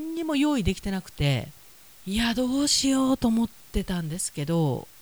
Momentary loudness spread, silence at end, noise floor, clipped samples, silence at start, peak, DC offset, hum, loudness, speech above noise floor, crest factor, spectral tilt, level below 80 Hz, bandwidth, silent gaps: 9 LU; 0.15 s; -51 dBFS; under 0.1%; 0 s; -10 dBFS; 0.2%; none; -26 LUFS; 26 dB; 16 dB; -4.5 dB/octave; -42 dBFS; over 20 kHz; none